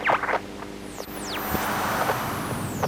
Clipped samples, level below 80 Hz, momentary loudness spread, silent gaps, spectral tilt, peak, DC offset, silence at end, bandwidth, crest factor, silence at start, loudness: under 0.1%; -48 dBFS; 12 LU; none; -4 dB/octave; -10 dBFS; under 0.1%; 0 s; over 20 kHz; 18 dB; 0 s; -27 LUFS